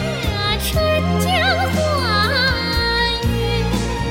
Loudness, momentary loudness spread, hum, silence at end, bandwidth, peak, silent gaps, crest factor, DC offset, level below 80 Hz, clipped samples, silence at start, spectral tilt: -18 LUFS; 4 LU; none; 0 s; 17 kHz; -4 dBFS; none; 14 dB; under 0.1%; -28 dBFS; under 0.1%; 0 s; -4.5 dB/octave